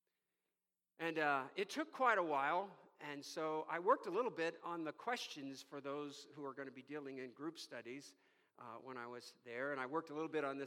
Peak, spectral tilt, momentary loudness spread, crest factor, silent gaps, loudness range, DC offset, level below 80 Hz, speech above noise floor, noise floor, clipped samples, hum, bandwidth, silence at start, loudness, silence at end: -22 dBFS; -4 dB/octave; 15 LU; 22 dB; none; 11 LU; under 0.1%; under -90 dBFS; over 47 dB; under -90 dBFS; under 0.1%; none; 16.5 kHz; 1 s; -43 LUFS; 0 s